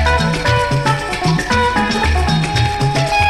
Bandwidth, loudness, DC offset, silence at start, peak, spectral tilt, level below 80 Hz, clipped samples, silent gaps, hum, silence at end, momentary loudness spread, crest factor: 13.5 kHz; -15 LUFS; 0.8%; 0 s; 0 dBFS; -5 dB/octave; -24 dBFS; under 0.1%; none; none; 0 s; 2 LU; 14 dB